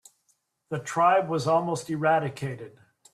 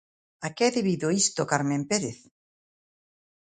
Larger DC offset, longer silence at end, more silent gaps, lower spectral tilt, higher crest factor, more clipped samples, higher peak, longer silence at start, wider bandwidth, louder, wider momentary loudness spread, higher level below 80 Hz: neither; second, 0.45 s vs 1.3 s; neither; first, -5.5 dB/octave vs -4 dB/octave; about the same, 18 dB vs 22 dB; neither; second, -10 dBFS vs -6 dBFS; first, 0.7 s vs 0.4 s; first, 13.5 kHz vs 9.6 kHz; about the same, -26 LUFS vs -26 LUFS; about the same, 14 LU vs 12 LU; about the same, -68 dBFS vs -68 dBFS